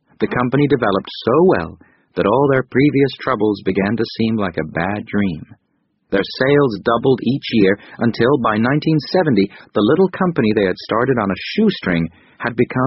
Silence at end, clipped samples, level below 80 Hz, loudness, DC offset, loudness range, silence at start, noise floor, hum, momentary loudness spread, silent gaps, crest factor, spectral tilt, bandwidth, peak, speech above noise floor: 0 s; under 0.1%; -48 dBFS; -17 LUFS; under 0.1%; 3 LU; 0.2 s; -66 dBFS; none; 7 LU; none; 16 dB; -5.5 dB/octave; 6 kHz; 0 dBFS; 49 dB